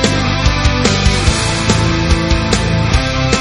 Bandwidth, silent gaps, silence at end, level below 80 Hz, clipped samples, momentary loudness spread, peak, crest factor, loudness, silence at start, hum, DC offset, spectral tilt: 11.5 kHz; none; 0 s; -18 dBFS; under 0.1%; 2 LU; 0 dBFS; 12 dB; -13 LUFS; 0 s; none; under 0.1%; -4.5 dB/octave